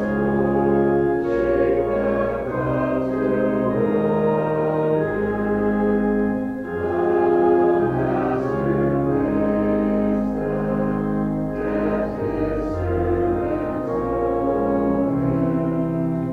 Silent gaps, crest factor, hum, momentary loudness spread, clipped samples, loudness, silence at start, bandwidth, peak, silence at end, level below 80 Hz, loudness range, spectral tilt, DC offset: none; 12 dB; none; 5 LU; under 0.1%; -21 LUFS; 0 s; 5.2 kHz; -8 dBFS; 0 s; -40 dBFS; 3 LU; -10 dB/octave; under 0.1%